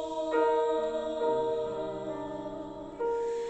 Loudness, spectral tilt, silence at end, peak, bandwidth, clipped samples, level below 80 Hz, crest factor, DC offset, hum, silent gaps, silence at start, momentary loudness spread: -31 LUFS; -5.5 dB/octave; 0 s; -16 dBFS; 8.4 kHz; under 0.1%; -60 dBFS; 14 dB; under 0.1%; none; none; 0 s; 12 LU